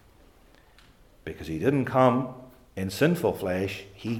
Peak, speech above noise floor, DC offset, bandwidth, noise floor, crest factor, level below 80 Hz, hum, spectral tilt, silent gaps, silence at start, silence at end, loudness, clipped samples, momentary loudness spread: -6 dBFS; 31 dB; under 0.1%; 17.5 kHz; -57 dBFS; 20 dB; -58 dBFS; none; -6.5 dB/octave; none; 1.25 s; 0 s; -26 LUFS; under 0.1%; 20 LU